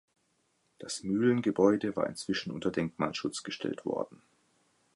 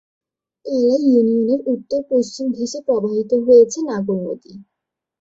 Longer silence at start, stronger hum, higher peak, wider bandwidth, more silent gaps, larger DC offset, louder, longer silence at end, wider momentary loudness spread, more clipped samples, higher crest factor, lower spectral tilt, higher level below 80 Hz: first, 0.8 s vs 0.65 s; neither; second, -12 dBFS vs -2 dBFS; first, 11.5 kHz vs 7.8 kHz; neither; neither; second, -31 LUFS vs -17 LUFS; first, 0.8 s vs 0.6 s; about the same, 11 LU vs 12 LU; neither; first, 22 dB vs 16 dB; about the same, -5.5 dB/octave vs -6 dB/octave; second, -68 dBFS vs -62 dBFS